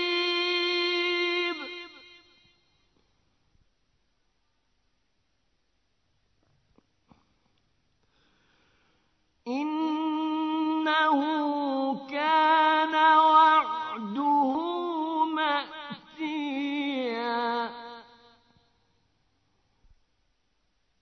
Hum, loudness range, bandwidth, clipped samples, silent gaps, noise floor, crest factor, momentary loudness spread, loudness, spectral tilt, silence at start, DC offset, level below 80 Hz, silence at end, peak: none; 14 LU; 6.4 kHz; under 0.1%; none; -75 dBFS; 20 dB; 15 LU; -26 LUFS; -4 dB/octave; 0 s; under 0.1%; -74 dBFS; 3 s; -8 dBFS